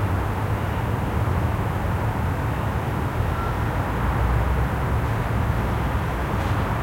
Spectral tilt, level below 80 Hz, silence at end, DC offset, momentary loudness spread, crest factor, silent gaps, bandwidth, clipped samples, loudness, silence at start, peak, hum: -7.5 dB/octave; -28 dBFS; 0 s; under 0.1%; 2 LU; 14 dB; none; 16.5 kHz; under 0.1%; -24 LUFS; 0 s; -10 dBFS; none